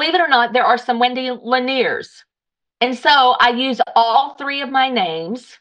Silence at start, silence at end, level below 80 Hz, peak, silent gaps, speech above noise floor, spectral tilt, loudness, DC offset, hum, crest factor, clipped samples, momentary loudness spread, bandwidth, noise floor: 0 s; 0.2 s; -64 dBFS; -2 dBFS; none; 67 dB; -3.5 dB/octave; -16 LUFS; under 0.1%; none; 16 dB; under 0.1%; 10 LU; 9.2 kHz; -83 dBFS